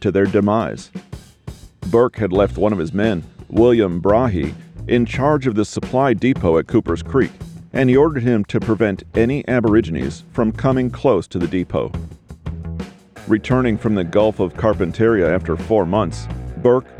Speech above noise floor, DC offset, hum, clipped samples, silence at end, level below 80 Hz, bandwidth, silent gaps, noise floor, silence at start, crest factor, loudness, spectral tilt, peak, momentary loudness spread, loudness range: 20 dB; under 0.1%; none; under 0.1%; 0 s; -36 dBFS; 11 kHz; none; -37 dBFS; 0 s; 14 dB; -18 LUFS; -7.5 dB/octave; -4 dBFS; 15 LU; 3 LU